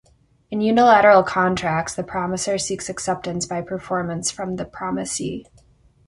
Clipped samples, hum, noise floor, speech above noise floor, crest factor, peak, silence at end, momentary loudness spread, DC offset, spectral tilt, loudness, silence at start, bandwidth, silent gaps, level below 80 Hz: under 0.1%; none; -55 dBFS; 35 dB; 18 dB; -2 dBFS; 0.65 s; 15 LU; under 0.1%; -4 dB/octave; -20 LUFS; 0.5 s; 11.5 kHz; none; -52 dBFS